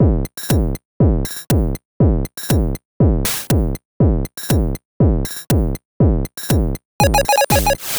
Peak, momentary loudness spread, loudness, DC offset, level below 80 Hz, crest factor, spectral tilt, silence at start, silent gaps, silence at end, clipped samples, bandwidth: -2 dBFS; 8 LU; -18 LUFS; under 0.1%; -22 dBFS; 14 dB; -5.5 dB/octave; 0 s; 0.85-1.00 s, 1.85-2.00 s, 2.85-3.00 s, 3.85-4.00 s, 4.85-5.00 s, 5.85-6.00 s, 6.85-7.00 s; 0 s; under 0.1%; over 20 kHz